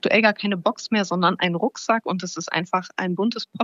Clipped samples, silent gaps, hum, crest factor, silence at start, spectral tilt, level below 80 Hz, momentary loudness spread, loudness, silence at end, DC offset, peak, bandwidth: under 0.1%; none; none; 20 dB; 0.05 s; -4.5 dB/octave; -78 dBFS; 7 LU; -23 LUFS; 0 s; under 0.1%; -2 dBFS; 7.6 kHz